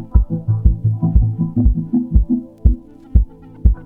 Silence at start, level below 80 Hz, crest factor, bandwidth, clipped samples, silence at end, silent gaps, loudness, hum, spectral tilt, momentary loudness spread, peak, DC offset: 0 s; -18 dBFS; 16 dB; 1.5 kHz; 0.2%; 0 s; none; -18 LUFS; none; -13.5 dB/octave; 3 LU; 0 dBFS; under 0.1%